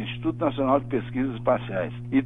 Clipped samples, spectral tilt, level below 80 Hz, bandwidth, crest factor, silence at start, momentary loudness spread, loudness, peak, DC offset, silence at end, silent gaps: under 0.1%; -9.5 dB/octave; -50 dBFS; 3.8 kHz; 18 dB; 0 s; 6 LU; -26 LUFS; -8 dBFS; under 0.1%; 0 s; none